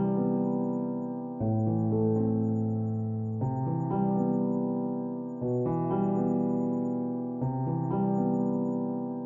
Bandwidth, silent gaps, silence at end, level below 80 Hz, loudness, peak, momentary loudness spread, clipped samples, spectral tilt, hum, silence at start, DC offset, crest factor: 3 kHz; none; 0 s; -60 dBFS; -29 LUFS; -16 dBFS; 5 LU; under 0.1%; -12.5 dB/octave; none; 0 s; under 0.1%; 14 dB